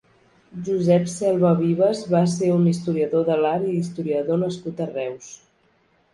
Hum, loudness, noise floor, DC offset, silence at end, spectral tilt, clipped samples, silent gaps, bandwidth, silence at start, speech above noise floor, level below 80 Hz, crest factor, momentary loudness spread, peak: none; -21 LUFS; -62 dBFS; under 0.1%; 0.8 s; -7.5 dB/octave; under 0.1%; none; 11.5 kHz; 0.55 s; 41 dB; -64 dBFS; 16 dB; 11 LU; -6 dBFS